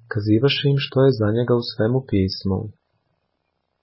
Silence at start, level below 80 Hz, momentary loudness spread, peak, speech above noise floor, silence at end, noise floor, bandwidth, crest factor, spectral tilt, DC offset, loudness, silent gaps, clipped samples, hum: 0.1 s; -44 dBFS; 8 LU; -6 dBFS; 54 dB; 1.1 s; -73 dBFS; 5.8 kHz; 16 dB; -11 dB/octave; under 0.1%; -20 LUFS; none; under 0.1%; none